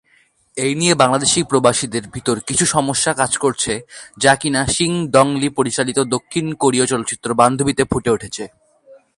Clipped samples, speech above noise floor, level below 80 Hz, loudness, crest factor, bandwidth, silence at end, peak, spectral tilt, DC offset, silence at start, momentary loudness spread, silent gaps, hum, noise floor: under 0.1%; 40 dB; -46 dBFS; -17 LUFS; 18 dB; 11.5 kHz; 0.25 s; 0 dBFS; -3.5 dB/octave; under 0.1%; 0.55 s; 8 LU; none; none; -57 dBFS